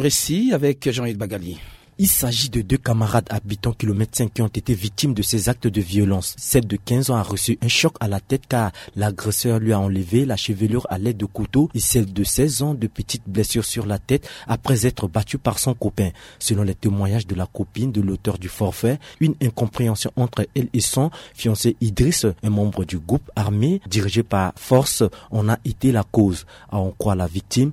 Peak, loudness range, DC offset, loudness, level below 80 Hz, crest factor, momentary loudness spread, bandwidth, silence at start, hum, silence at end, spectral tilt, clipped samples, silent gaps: -2 dBFS; 2 LU; under 0.1%; -21 LUFS; -40 dBFS; 18 dB; 7 LU; 16 kHz; 0 s; none; 0 s; -5 dB/octave; under 0.1%; none